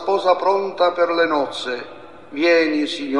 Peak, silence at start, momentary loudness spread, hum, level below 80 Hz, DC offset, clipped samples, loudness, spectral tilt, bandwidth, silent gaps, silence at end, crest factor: -2 dBFS; 0 s; 12 LU; none; -66 dBFS; 0.5%; under 0.1%; -19 LUFS; -4 dB/octave; 10.5 kHz; none; 0 s; 16 dB